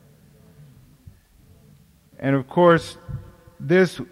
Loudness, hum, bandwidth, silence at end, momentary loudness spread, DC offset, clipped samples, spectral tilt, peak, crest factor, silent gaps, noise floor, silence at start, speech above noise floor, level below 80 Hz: -19 LUFS; none; 13.5 kHz; 0.1 s; 20 LU; under 0.1%; under 0.1%; -7 dB/octave; -4 dBFS; 20 dB; none; -53 dBFS; 2.2 s; 34 dB; -52 dBFS